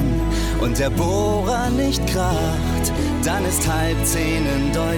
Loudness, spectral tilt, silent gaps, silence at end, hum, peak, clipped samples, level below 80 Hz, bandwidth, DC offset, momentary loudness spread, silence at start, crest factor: -20 LUFS; -5 dB/octave; none; 0 s; none; -10 dBFS; under 0.1%; -26 dBFS; 19 kHz; under 0.1%; 2 LU; 0 s; 10 dB